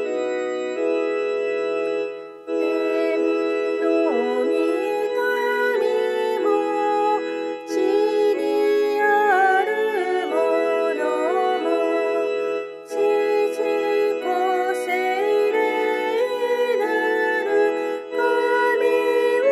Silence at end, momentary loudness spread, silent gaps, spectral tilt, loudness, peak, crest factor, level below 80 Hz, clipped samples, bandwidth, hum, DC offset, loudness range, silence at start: 0 s; 6 LU; none; -3 dB/octave; -21 LUFS; -6 dBFS; 14 dB; -80 dBFS; under 0.1%; 13 kHz; none; under 0.1%; 2 LU; 0 s